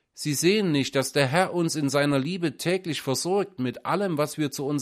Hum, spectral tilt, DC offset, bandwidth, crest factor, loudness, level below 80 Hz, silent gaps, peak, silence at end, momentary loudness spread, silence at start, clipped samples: none; -4.5 dB/octave; under 0.1%; 15.5 kHz; 20 dB; -25 LUFS; -66 dBFS; none; -6 dBFS; 0 s; 6 LU; 0.15 s; under 0.1%